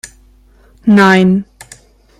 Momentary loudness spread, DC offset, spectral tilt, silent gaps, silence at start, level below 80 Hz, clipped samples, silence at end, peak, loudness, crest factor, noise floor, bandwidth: 13 LU; under 0.1%; -6.5 dB/octave; none; 0.05 s; -46 dBFS; under 0.1%; 0.75 s; 0 dBFS; -10 LUFS; 14 dB; -46 dBFS; 12 kHz